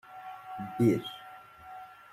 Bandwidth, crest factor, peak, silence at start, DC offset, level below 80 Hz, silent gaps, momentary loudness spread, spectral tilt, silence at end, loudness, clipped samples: 16 kHz; 20 dB; -14 dBFS; 0.05 s; under 0.1%; -68 dBFS; none; 21 LU; -7.5 dB/octave; 0.05 s; -31 LUFS; under 0.1%